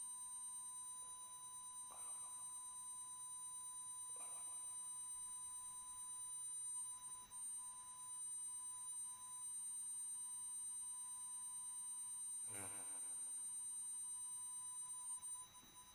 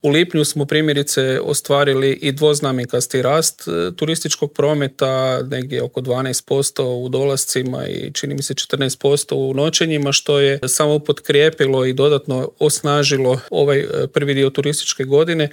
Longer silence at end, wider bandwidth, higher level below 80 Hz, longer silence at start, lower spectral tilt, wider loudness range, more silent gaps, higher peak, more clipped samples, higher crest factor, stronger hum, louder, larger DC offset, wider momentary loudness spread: about the same, 0 s vs 0 s; about the same, 16.5 kHz vs 17.5 kHz; second, -84 dBFS vs -62 dBFS; about the same, 0 s vs 0.05 s; second, 1 dB/octave vs -4 dB/octave; about the same, 3 LU vs 4 LU; neither; second, -38 dBFS vs -2 dBFS; neither; about the same, 14 dB vs 16 dB; neither; second, -48 LUFS vs -17 LUFS; neither; about the same, 4 LU vs 6 LU